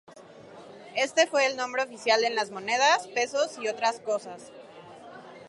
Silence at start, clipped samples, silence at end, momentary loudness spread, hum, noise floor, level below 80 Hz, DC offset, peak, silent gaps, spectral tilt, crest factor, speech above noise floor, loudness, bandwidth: 0.1 s; under 0.1%; 0 s; 24 LU; none; -49 dBFS; -80 dBFS; under 0.1%; -8 dBFS; none; -1 dB/octave; 20 dB; 22 dB; -26 LUFS; 11.5 kHz